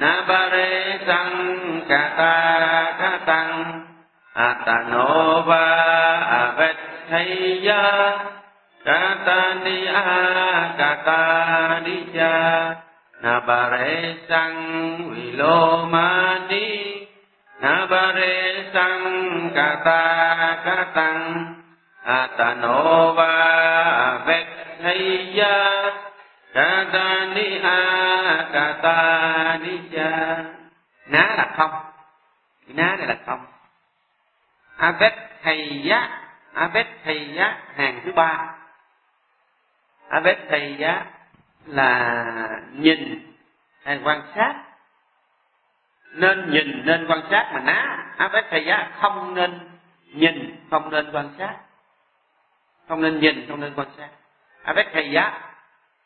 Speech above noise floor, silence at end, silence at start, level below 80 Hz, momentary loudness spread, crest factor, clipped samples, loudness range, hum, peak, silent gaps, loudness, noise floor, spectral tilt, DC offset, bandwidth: 47 dB; 0.55 s; 0 s; -66 dBFS; 12 LU; 20 dB; under 0.1%; 7 LU; none; -2 dBFS; none; -19 LUFS; -67 dBFS; -9 dB/octave; under 0.1%; 4.5 kHz